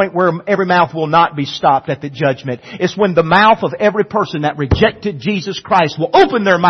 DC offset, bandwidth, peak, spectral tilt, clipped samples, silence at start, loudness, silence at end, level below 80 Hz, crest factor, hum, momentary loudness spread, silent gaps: under 0.1%; 6.4 kHz; 0 dBFS; -6 dB/octave; under 0.1%; 0 s; -14 LUFS; 0 s; -38 dBFS; 14 dB; none; 9 LU; none